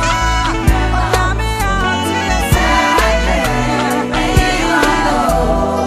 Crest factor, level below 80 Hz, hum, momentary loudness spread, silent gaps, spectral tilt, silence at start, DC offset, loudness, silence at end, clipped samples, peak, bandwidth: 14 dB; -20 dBFS; none; 4 LU; none; -4.5 dB/octave; 0 s; under 0.1%; -14 LUFS; 0 s; under 0.1%; 0 dBFS; 15.5 kHz